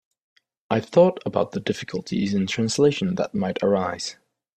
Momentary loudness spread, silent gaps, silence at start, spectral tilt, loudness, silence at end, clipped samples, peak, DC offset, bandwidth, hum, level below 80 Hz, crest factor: 10 LU; none; 0.7 s; -5.5 dB/octave; -23 LUFS; 0.45 s; under 0.1%; -4 dBFS; under 0.1%; 10.5 kHz; none; -60 dBFS; 20 dB